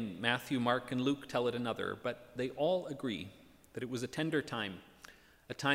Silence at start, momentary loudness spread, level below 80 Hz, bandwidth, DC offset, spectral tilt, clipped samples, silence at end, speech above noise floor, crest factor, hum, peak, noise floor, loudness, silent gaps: 0 s; 16 LU; -70 dBFS; 16 kHz; under 0.1%; -5 dB/octave; under 0.1%; 0 s; 23 dB; 22 dB; none; -14 dBFS; -59 dBFS; -36 LUFS; none